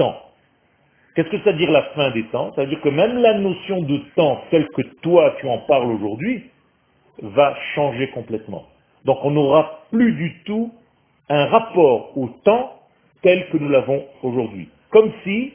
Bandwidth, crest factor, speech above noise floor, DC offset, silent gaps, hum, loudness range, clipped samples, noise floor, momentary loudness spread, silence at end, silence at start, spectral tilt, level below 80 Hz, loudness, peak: 3.6 kHz; 18 dB; 42 dB; under 0.1%; none; none; 3 LU; under 0.1%; -60 dBFS; 11 LU; 0.05 s; 0 s; -10.5 dB/octave; -58 dBFS; -19 LUFS; 0 dBFS